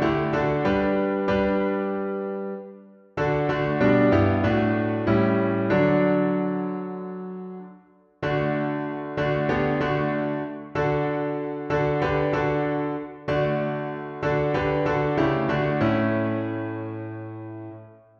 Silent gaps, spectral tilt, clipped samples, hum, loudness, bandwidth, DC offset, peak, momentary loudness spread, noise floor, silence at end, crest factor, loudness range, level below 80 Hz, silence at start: none; -8.5 dB/octave; under 0.1%; none; -24 LUFS; 6.8 kHz; under 0.1%; -8 dBFS; 13 LU; -53 dBFS; 0.25 s; 16 dB; 5 LU; -48 dBFS; 0 s